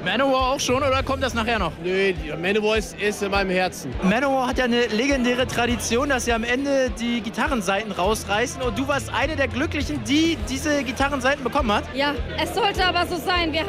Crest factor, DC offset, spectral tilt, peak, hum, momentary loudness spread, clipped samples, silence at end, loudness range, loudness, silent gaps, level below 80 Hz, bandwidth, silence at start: 12 dB; under 0.1%; -4 dB/octave; -10 dBFS; none; 4 LU; under 0.1%; 0 s; 2 LU; -22 LUFS; none; -36 dBFS; 16 kHz; 0 s